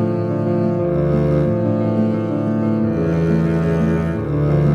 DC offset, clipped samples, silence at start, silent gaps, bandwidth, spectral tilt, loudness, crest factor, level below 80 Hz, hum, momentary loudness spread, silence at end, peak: under 0.1%; under 0.1%; 0 s; none; 6.8 kHz; -10 dB/octave; -18 LUFS; 12 dB; -36 dBFS; none; 3 LU; 0 s; -4 dBFS